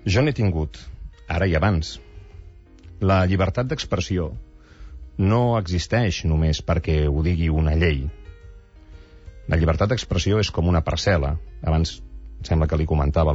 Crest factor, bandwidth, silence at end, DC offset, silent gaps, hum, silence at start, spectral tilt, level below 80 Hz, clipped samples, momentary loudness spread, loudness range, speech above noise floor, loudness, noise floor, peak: 14 dB; 8 kHz; 0 s; under 0.1%; none; none; 0 s; -6.5 dB/octave; -32 dBFS; under 0.1%; 14 LU; 2 LU; 24 dB; -22 LUFS; -45 dBFS; -8 dBFS